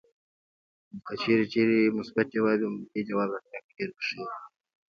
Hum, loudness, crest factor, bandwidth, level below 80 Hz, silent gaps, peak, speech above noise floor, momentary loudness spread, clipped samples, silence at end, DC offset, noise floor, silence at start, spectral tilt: none; -28 LUFS; 18 dB; 6.8 kHz; -72 dBFS; 3.64-3.69 s; -10 dBFS; over 62 dB; 17 LU; under 0.1%; 0.4 s; under 0.1%; under -90 dBFS; 0.95 s; -7 dB/octave